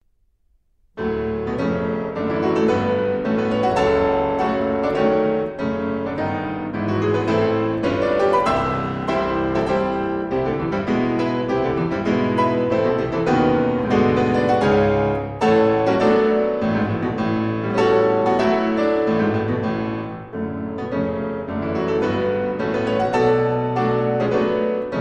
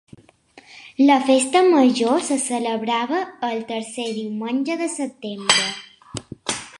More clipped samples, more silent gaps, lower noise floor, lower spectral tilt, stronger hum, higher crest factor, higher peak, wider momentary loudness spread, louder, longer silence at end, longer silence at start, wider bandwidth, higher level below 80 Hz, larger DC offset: neither; neither; first, -62 dBFS vs -50 dBFS; first, -7.5 dB/octave vs -3 dB/octave; neither; second, 14 dB vs 20 dB; about the same, -4 dBFS vs -2 dBFS; second, 7 LU vs 14 LU; about the same, -20 LUFS vs -20 LUFS; about the same, 0 s vs 0.05 s; first, 0.95 s vs 0.55 s; second, 9.2 kHz vs 11.5 kHz; first, -44 dBFS vs -62 dBFS; neither